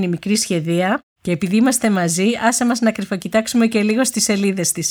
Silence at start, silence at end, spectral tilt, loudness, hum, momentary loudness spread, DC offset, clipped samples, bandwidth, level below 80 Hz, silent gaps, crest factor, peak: 0 s; 0 s; -4 dB/octave; -17 LUFS; none; 5 LU; under 0.1%; under 0.1%; over 20 kHz; -56 dBFS; 1.03-1.16 s; 14 dB; -2 dBFS